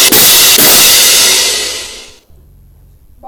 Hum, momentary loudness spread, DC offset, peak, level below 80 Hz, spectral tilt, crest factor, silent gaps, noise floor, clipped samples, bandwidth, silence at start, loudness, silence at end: none; 15 LU; under 0.1%; 0 dBFS; -40 dBFS; 0.5 dB/octave; 8 dB; none; -40 dBFS; 0.4%; over 20 kHz; 0 s; -3 LUFS; 0 s